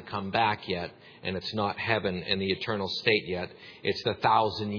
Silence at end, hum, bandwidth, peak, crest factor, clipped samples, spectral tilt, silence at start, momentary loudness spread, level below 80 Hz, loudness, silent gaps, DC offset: 0 s; none; 5.4 kHz; -8 dBFS; 22 dB; under 0.1%; -6 dB/octave; 0 s; 10 LU; -62 dBFS; -29 LUFS; none; under 0.1%